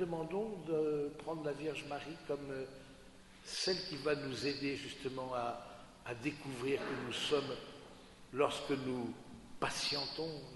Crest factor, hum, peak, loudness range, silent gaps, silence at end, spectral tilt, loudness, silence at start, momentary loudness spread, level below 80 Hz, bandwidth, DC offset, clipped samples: 22 dB; none; -18 dBFS; 2 LU; none; 0 s; -4 dB/octave; -39 LUFS; 0 s; 17 LU; -66 dBFS; 11.5 kHz; under 0.1%; under 0.1%